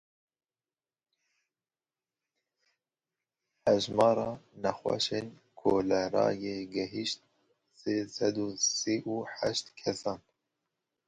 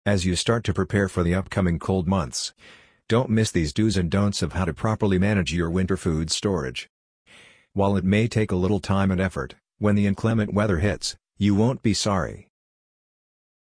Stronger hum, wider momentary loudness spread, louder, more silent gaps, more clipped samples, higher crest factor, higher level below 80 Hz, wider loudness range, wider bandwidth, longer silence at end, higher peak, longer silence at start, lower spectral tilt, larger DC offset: neither; first, 10 LU vs 7 LU; second, -31 LUFS vs -23 LUFS; second, none vs 6.89-7.25 s; neither; about the same, 22 dB vs 18 dB; second, -68 dBFS vs -42 dBFS; about the same, 3 LU vs 2 LU; about the same, 11 kHz vs 10.5 kHz; second, 0.9 s vs 1.2 s; second, -10 dBFS vs -6 dBFS; first, 3.65 s vs 0.05 s; second, -3.5 dB/octave vs -5.5 dB/octave; neither